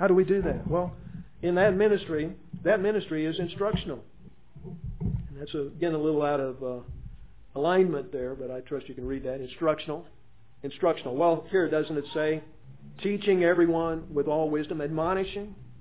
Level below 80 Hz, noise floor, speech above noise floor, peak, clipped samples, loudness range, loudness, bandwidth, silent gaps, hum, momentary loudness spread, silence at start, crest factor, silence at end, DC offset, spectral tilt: -48 dBFS; -51 dBFS; 24 dB; -10 dBFS; under 0.1%; 5 LU; -28 LUFS; 4 kHz; none; none; 16 LU; 0 s; 18 dB; 0 s; 0.4%; -10.5 dB/octave